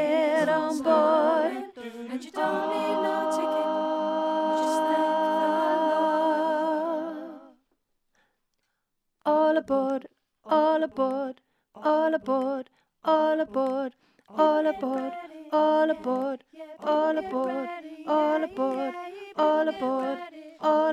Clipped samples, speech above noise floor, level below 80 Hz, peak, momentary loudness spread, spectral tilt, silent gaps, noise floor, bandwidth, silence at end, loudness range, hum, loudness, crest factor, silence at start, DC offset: under 0.1%; 53 dB; -72 dBFS; -10 dBFS; 13 LU; -5 dB/octave; none; -79 dBFS; 13 kHz; 0 s; 4 LU; none; -26 LUFS; 18 dB; 0 s; under 0.1%